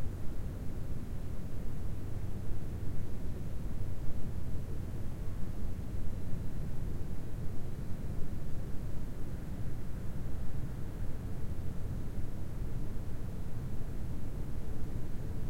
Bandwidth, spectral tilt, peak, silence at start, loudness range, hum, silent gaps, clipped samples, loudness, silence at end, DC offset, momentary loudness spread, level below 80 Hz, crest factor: 8.6 kHz; -7.5 dB/octave; -16 dBFS; 0 s; 1 LU; none; none; under 0.1%; -42 LUFS; 0 s; under 0.1%; 1 LU; -40 dBFS; 14 dB